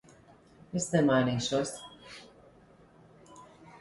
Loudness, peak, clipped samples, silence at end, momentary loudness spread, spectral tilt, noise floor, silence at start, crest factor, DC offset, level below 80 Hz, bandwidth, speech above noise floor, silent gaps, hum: -29 LUFS; -12 dBFS; under 0.1%; 0.05 s; 23 LU; -5 dB/octave; -58 dBFS; 0.75 s; 20 dB; under 0.1%; -64 dBFS; 11.5 kHz; 30 dB; none; none